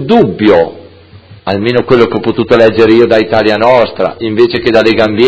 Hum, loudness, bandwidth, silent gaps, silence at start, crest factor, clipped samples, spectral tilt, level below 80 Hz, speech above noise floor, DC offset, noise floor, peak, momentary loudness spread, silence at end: none; -9 LUFS; 8 kHz; none; 0 s; 8 dB; 2%; -7 dB/octave; -38 dBFS; 28 dB; under 0.1%; -35 dBFS; 0 dBFS; 8 LU; 0 s